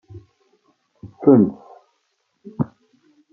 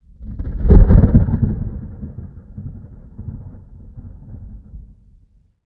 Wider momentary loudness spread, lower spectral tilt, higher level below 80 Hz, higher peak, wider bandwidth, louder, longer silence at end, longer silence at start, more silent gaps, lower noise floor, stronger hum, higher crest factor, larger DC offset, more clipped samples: about the same, 25 LU vs 27 LU; about the same, -12.5 dB/octave vs -13 dB/octave; second, -62 dBFS vs -20 dBFS; about the same, -2 dBFS vs 0 dBFS; about the same, 2.3 kHz vs 2.2 kHz; second, -18 LUFS vs -15 LUFS; second, 0.7 s vs 0.85 s; about the same, 0.15 s vs 0.2 s; neither; first, -70 dBFS vs -53 dBFS; neither; about the same, 20 dB vs 18 dB; neither; neither